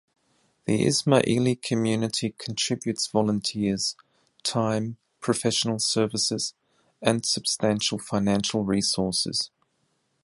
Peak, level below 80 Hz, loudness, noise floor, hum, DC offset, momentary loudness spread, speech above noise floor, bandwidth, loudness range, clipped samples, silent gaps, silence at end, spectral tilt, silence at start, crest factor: -4 dBFS; -58 dBFS; -25 LUFS; -72 dBFS; none; under 0.1%; 7 LU; 47 dB; 11.5 kHz; 2 LU; under 0.1%; none; 0.75 s; -4 dB/octave; 0.65 s; 22 dB